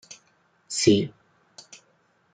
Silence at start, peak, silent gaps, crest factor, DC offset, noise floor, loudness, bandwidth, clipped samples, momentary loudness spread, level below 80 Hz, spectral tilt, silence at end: 0.1 s; -4 dBFS; none; 24 dB; under 0.1%; -65 dBFS; -23 LUFS; 9.4 kHz; under 0.1%; 26 LU; -68 dBFS; -4.5 dB/octave; 1.25 s